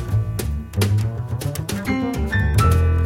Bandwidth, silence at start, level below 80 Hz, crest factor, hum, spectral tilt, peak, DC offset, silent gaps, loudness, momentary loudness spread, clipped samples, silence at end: 16.5 kHz; 0 s; -26 dBFS; 14 dB; none; -6 dB/octave; -4 dBFS; under 0.1%; none; -21 LUFS; 9 LU; under 0.1%; 0 s